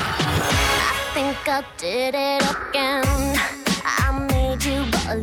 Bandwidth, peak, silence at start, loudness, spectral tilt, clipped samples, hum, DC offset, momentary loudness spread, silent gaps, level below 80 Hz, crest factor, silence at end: 18.5 kHz; -6 dBFS; 0 s; -21 LUFS; -4 dB/octave; under 0.1%; none; under 0.1%; 5 LU; none; -30 dBFS; 16 dB; 0 s